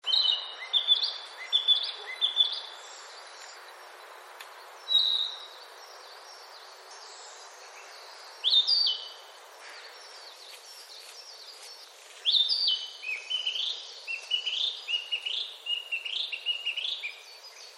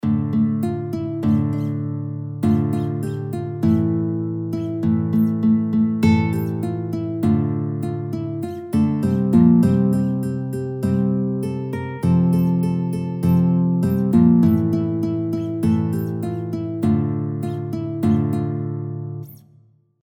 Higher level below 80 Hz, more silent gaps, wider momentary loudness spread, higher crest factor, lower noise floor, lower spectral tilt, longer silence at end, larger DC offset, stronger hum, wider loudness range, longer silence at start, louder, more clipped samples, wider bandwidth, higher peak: second, under -90 dBFS vs -50 dBFS; neither; first, 23 LU vs 10 LU; about the same, 20 dB vs 16 dB; second, -49 dBFS vs -54 dBFS; second, 6 dB/octave vs -9.5 dB/octave; second, 0 s vs 0.65 s; neither; neither; about the same, 5 LU vs 4 LU; about the same, 0.05 s vs 0.05 s; second, -27 LUFS vs -20 LUFS; neither; about the same, 16 kHz vs 15.5 kHz; second, -12 dBFS vs -4 dBFS